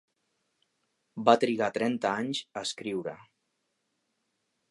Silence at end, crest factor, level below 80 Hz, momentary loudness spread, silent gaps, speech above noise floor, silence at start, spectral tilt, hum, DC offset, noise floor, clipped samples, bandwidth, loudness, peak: 1.55 s; 26 dB; -78 dBFS; 12 LU; none; 51 dB; 1.15 s; -4.5 dB/octave; none; under 0.1%; -79 dBFS; under 0.1%; 11.5 kHz; -29 LUFS; -6 dBFS